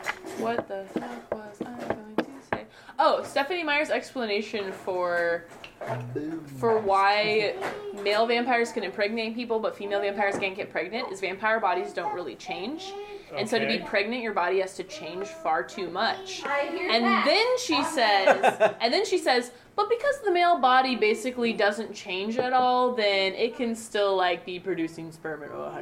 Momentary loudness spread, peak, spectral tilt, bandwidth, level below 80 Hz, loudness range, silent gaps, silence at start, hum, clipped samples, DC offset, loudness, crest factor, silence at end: 14 LU; -6 dBFS; -3.5 dB/octave; 16 kHz; -64 dBFS; 6 LU; none; 0 s; none; under 0.1%; under 0.1%; -26 LUFS; 20 dB; 0 s